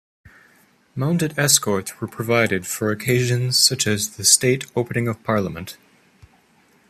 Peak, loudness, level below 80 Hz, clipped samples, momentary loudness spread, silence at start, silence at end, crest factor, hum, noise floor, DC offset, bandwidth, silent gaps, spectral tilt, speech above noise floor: 0 dBFS; -19 LUFS; -58 dBFS; under 0.1%; 14 LU; 0.95 s; 1.15 s; 22 dB; none; -57 dBFS; under 0.1%; 15 kHz; none; -3 dB/octave; 37 dB